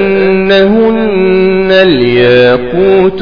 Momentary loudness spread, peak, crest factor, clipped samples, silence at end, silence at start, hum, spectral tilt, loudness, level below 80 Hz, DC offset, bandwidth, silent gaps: 3 LU; 0 dBFS; 8 dB; 2%; 0 s; 0 s; none; -8 dB/octave; -7 LUFS; -36 dBFS; 3%; 5.4 kHz; none